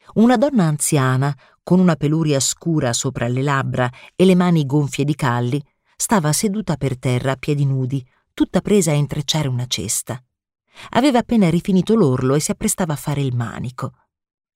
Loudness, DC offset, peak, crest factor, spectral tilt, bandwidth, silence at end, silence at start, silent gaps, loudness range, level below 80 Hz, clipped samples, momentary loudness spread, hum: -18 LUFS; under 0.1%; -4 dBFS; 14 dB; -5.5 dB/octave; 16 kHz; 0.65 s; 0.15 s; none; 3 LU; -48 dBFS; under 0.1%; 8 LU; none